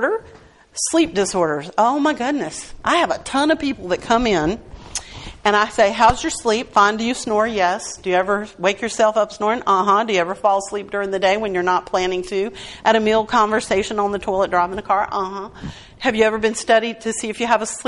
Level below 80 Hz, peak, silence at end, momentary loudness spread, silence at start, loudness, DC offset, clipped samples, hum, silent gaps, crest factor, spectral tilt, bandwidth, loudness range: -44 dBFS; -2 dBFS; 0 s; 9 LU; 0 s; -19 LUFS; under 0.1%; under 0.1%; none; none; 16 dB; -3.5 dB/octave; 11.5 kHz; 2 LU